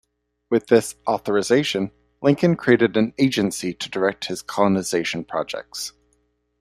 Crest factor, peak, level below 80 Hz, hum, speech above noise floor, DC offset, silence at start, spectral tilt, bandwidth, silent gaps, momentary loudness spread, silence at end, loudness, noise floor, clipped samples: 20 dB; -2 dBFS; -60 dBFS; 60 Hz at -50 dBFS; 47 dB; under 0.1%; 0.5 s; -5 dB/octave; 15.5 kHz; none; 12 LU; 0.7 s; -21 LUFS; -67 dBFS; under 0.1%